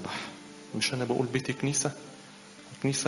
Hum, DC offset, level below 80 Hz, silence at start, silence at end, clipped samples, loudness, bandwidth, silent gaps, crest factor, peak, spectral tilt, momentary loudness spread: none; under 0.1%; -66 dBFS; 0 s; 0 s; under 0.1%; -31 LUFS; 11.5 kHz; none; 20 dB; -12 dBFS; -4 dB/octave; 20 LU